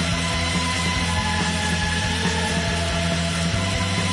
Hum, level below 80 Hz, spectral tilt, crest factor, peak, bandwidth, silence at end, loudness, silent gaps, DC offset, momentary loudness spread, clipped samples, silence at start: none; -36 dBFS; -4 dB/octave; 12 dB; -10 dBFS; 11.5 kHz; 0 s; -22 LUFS; none; under 0.1%; 1 LU; under 0.1%; 0 s